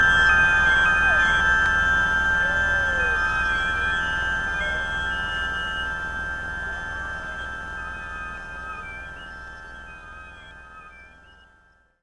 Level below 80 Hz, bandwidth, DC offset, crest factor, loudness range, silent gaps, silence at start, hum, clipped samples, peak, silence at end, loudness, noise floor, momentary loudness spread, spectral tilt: -38 dBFS; 11.5 kHz; 0.1%; 18 dB; 18 LU; none; 0 s; 60 Hz at -40 dBFS; under 0.1%; -6 dBFS; 0.95 s; -21 LUFS; -59 dBFS; 22 LU; -3 dB/octave